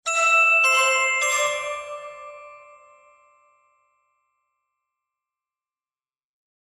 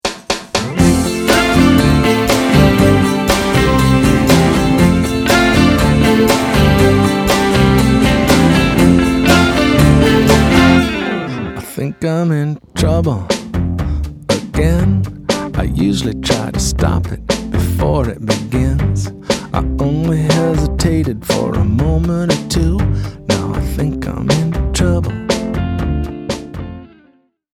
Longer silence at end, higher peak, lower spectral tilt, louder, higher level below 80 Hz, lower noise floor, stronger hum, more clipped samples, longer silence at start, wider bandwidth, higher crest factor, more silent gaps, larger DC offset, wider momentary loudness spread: first, 4.05 s vs 0.7 s; second, -8 dBFS vs 0 dBFS; second, 3 dB/octave vs -5.5 dB/octave; second, -18 LUFS vs -13 LUFS; second, -72 dBFS vs -24 dBFS; first, under -90 dBFS vs -53 dBFS; neither; neither; about the same, 0.05 s vs 0.05 s; second, 14 kHz vs 17.5 kHz; first, 18 dB vs 12 dB; neither; neither; first, 23 LU vs 9 LU